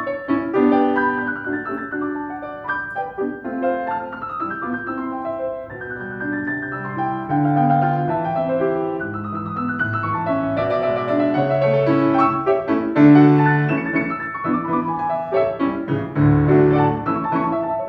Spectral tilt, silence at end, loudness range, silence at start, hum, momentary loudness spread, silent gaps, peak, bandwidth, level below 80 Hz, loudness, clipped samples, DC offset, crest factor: -10 dB/octave; 0 s; 9 LU; 0 s; none; 12 LU; none; -2 dBFS; 5.2 kHz; -48 dBFS; -20 LUFS; under 0.1%; under 0.1%; 18 dB